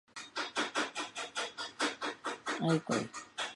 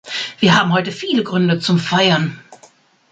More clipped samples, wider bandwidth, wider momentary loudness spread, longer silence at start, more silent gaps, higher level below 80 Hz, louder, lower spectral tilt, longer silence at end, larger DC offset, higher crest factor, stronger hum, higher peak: neither; first, 11.5 kHz vs 8.6 kHz; about the same, 7 LU vs 6 LU; about the same, 0.15 s vs 0.05 s; neither; second, -78 dBFS vs -58 dBFS; second, -36 LUFS vs -16 LUFS; second, -3.5 dB/octave vs -5.5 dB/octave; second, 0 s vs 0.55 s; neither; about the same, 20 dB vs 16 dB; neither; second, -18 dBFS vs 0 dBFS